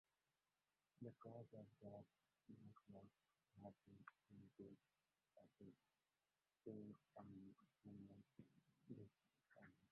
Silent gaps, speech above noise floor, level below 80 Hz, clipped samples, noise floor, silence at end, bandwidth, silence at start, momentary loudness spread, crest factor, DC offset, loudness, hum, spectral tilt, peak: none; over 26 dB; under -90 dBFS; under 0.1%; under -90 dBFS; 0.05 s; 4.3 kHz; 1 s; 8 LU; 22 dB; under 0.1%; -65 LUFS; none; -8.5 dB/octave; -44 dBFS